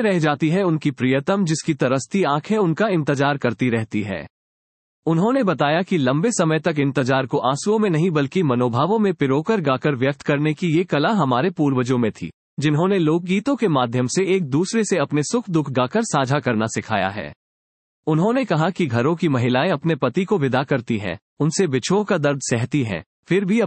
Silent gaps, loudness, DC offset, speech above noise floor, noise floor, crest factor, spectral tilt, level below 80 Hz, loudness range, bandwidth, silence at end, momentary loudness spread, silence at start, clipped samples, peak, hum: 4.30-5.03 s, 12.34-12.57 s, 17.36-18.03 s, 21.22-21.37 s, 23.06-23.23 s; -20 LUFS; under 0.1%; over 71 dB; under -90 dBFS; 16 dB; -6 dB/octave; -62 dBFS; 2 LU; 8.8 kHz; 0 s; 4 LU; 0 s; under 0.1%; -4 dBFS; none